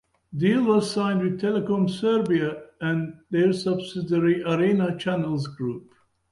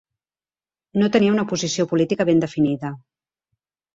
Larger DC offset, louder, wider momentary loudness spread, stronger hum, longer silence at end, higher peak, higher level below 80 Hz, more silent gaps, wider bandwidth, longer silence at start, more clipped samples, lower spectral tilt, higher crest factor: neither; second, -24 LUFS vs -20 LUFS; about the same, 9 LU vs 11 LU; neither; second, 0.5 s vs 0.95 s; second, -8 dBFS vs -4 dBFS; about the same, -62 dBFS vs -60 dBFS; neither; first, 11.5 kHz vs 7.8 kHz; second, 0.3 s vs 0.95 s; neither; first, -7 dB/octave vs -5.5 dB/octave; about the same, 16 dB vs 18 dB